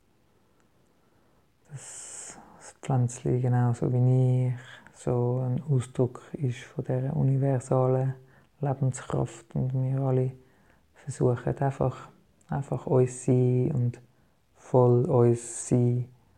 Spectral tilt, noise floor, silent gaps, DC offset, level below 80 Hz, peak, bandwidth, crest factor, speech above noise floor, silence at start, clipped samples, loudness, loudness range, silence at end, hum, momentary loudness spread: -8 dB/octave; -66 dBFS; none; under 0.1%; -58 dBFS; -8 dBFS; 10 kHz; 20 dB; 41 dB; 1.7 s; under 0.1%; -27 LUFS; 5 LU; 0.3 s; none; 17 LU